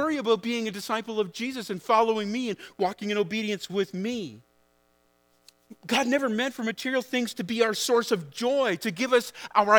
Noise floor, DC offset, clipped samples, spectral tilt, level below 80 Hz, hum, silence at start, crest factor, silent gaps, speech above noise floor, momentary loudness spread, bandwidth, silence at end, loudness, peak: -66 dBFS; under 0.1%; under 0.1%; -4 dB/octave; -74 dBFS; 60 Hz at -60 dBFS; 0 s; 24 dB; none; 40 dB; 8 LU; over 20 kHz; 0 s; -27 LUFS; -2 dBFS